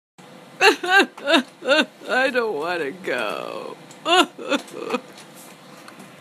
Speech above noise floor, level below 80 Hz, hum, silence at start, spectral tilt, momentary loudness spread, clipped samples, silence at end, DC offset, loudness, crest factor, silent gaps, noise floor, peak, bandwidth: 22 dB; -74 dBFS; none; 0.3 s; -2 dB/octave; 16 LU; under 0.1%; 0.1 s; under 0.1%; -20 LUFS; 22 dB; none; -43 dBFS; 0 dBFS; 15.5 kHz